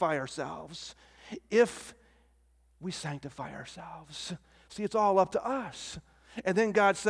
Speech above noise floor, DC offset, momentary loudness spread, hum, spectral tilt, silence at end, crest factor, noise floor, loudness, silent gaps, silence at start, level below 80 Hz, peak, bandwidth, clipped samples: 35 dB; under 0.1%; 20 LU; none; -4.5 dB/octave; 0 s; 20 dB; -66 dBFS; -31 LUFS; none; 0 s; -64 dBFS; -12 dBFS; 11 kHz; under 0.1%